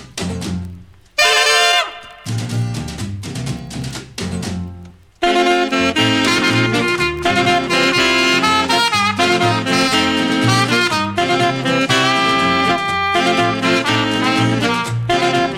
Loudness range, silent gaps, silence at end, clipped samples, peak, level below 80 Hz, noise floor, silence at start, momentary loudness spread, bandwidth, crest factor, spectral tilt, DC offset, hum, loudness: 6 LU; none; 0 s; under 0.1%; 0 dBFS; -44 dBFS; -37 dBFS; 0 s; 13 LU; 17.5 kHz; 16 dB; -4 dB/octave; under 0.1%; none; -15 LUFS